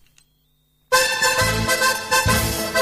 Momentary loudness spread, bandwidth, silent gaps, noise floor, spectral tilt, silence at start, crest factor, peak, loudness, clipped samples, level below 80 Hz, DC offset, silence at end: 3 LU; 16 kHz; none; -63 dBFS; -2.5 dB/octave; 0.9 s; 16 dB; -6 dBFS; -18 LUFS; under 0.1%; -36 dBFS; under 0.1%; 0 s